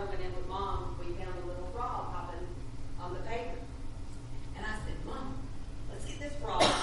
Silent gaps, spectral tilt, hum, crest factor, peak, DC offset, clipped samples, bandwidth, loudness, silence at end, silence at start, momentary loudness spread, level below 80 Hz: none; -4.5 dB/octave; none; 24 dB; -10 dBFS; under 0.1%; under 0.1%; 11.5 kHz; -39 LUFS; 0 s; 0 s; 9 LU; -42 dBFS